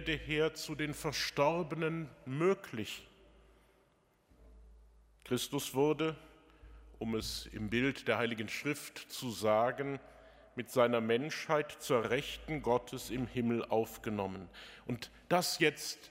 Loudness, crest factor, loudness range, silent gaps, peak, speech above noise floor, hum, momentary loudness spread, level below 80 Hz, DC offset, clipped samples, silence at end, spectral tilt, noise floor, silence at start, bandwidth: -35 LUFS; 22 dB; 6 LU; none; -14 dBFS; 36 dB; none; 11 LU; -60 dBFS; under 0.1%; under 0.1%; 0 s; -4.5 dB/octave; -71 dBFS; 0 s; 16 kHz